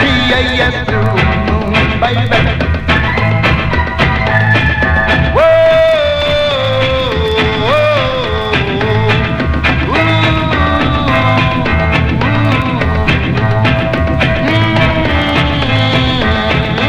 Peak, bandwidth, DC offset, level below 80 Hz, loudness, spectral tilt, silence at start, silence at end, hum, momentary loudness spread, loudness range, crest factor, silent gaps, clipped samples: 0 dBFS; 9.8 kHz; under 0.1%; -22 dBFS; -11 LUFS; -6.5 dB/octave; 0 s; 0 s; none; 3 LU; 2 LU; 10 dB; none; under 0.1%